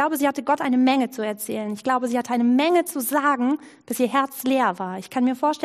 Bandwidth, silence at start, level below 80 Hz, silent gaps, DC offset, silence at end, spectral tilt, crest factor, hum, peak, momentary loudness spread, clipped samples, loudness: 15.5 kHz; 0 s; -74 dBFS; none; under 0.1%; 0 s; -4 dB/octave; 16 dB; none; -6 dBFS; 9 LU; under 0.1%; -22 LUFS